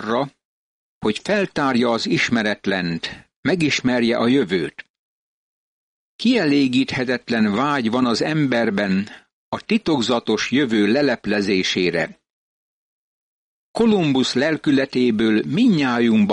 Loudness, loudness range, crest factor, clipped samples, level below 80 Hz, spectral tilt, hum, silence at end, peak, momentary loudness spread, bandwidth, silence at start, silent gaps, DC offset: -19 LUFS; 3 LU; 14 dB; under 0.1%; -56 dBFS; -5.5 dB/octave; none; 0 s; -6 dBFS; 7 LU; 10.5 kHz; 0 s; 0.45-1.01 s, 3.36-3.43 s, 4.90-6.19 s, 9.33-9.52 s, 12.30-13.74 s; under 0.1%